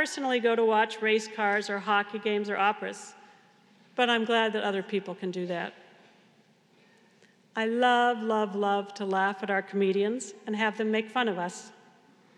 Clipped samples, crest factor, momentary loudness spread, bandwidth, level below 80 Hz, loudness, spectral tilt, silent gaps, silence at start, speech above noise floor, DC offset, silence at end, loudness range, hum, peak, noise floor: under 0.1%; 20 dB; 11 LU; 11.5 kHz; under -90 dBFS; -28 LUFS; -4 dB/octave; none; 0 s; 35 dB; under 0.1%; 0.65 s; 4 LU; none; -10 dBFS; -63 dBFS